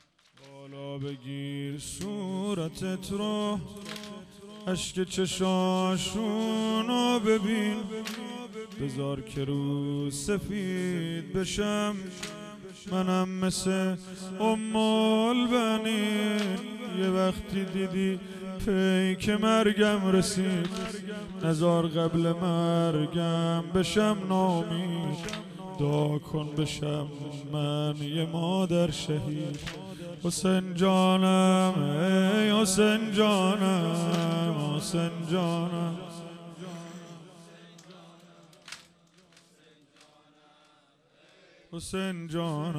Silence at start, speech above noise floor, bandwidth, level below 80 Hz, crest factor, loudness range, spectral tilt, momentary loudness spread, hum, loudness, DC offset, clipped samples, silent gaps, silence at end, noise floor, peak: 0.45 s; 36 dB; 14.5 kHz; -56 dBFS; 18 dB; 9 LU; -5.5 dB/octave; 15 LU; none; -28 LUFS; under 0.1%; under 0.1%; none; 0 s; -64 dBFS; -10 dBFS